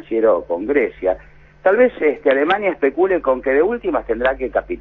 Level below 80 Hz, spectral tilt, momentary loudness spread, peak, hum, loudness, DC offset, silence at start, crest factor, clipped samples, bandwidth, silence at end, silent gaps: -44 dBFS; -7.5 dB/octave; 7 LU; -2 dBFS; none; -18 LUFS; under 0.1%; 0.1 s; 16 dB; under 0.1%; 4.1 kHz; 0 s; none